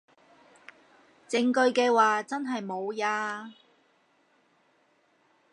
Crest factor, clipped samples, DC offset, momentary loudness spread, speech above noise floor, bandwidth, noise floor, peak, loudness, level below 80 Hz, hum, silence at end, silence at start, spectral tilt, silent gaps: 20 dB; under 0.1%; under 0.1%; 12 LU; 41 dB; 11 kHz; -67 dBFS; -10 dBFS; -27 LUFS; -86 dBFS; none; 2 s; 1.3 s; -3.5 dB/octave; none